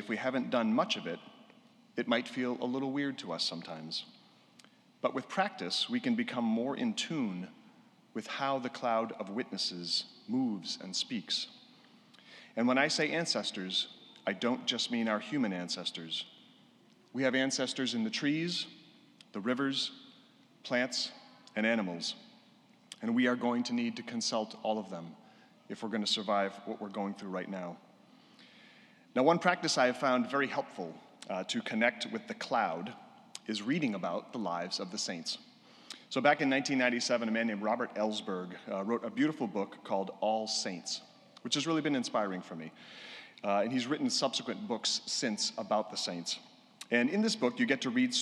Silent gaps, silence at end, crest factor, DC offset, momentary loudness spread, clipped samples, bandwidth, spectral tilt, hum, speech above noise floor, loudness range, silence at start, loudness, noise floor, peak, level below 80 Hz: none; 0 s; 22 dB; under 0.1%; 13 LU; under 0.1%; 12 kHz; -3.5 dB/octave; none; 30 dB; 4 LU; 0 s; -33 LUFS; -63 dBFS; -12 dBFS; under -90 dBFS